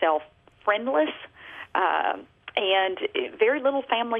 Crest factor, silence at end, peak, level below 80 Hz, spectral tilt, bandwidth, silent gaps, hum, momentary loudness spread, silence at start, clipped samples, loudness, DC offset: 18 dB; 0 s; -8 dBFS; -70 dBFS; -5.5 dB/octave; 4.5 kHz; none; none; 10 LU; 0 s; under 0.1%; -25 LUFS; under 0.1%